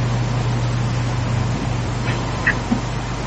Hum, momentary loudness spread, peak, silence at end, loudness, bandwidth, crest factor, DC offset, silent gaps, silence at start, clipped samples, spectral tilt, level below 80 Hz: none; 3 LU; -4 dBFS; 0 s; -21 LUFS; 8.6 kHz; 16 dB; under 0.1%; none; 0 s; under 0.1%; -6 dB/octave; -32 dBFS